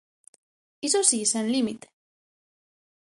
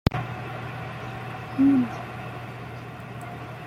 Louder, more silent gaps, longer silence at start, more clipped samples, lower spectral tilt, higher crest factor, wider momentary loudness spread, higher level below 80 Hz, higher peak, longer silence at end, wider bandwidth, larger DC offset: first, -23 LUFS vs -29 LUFS; neither; first, 0.85 s vs 0.05 s; neither; second, -2 dB/octave vs -7.5 dB/octave; about the same, 22 dB vs 26 dB; second, 12 LU vs 17 LU; second, -74 dBFS vs -46 dBFS; second, -6 dBFS vs -2 dBFS; first, 1.4 s vs 0 s; second, 11.5 kHz vs 13.5 kHz; neither